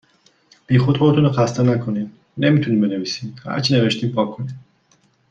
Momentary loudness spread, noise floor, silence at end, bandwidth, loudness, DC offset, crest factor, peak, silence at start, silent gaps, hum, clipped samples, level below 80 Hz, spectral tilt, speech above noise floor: 11 LU; -59 dBFS; 0.7 s; 7.6 kHz; -18 LUFS; under 0.1%; 16 dB; -2 dBFS; 0.7 s; none; none; under 0.1%; -58 dBFS; -6.5 dB/octave; 42 dB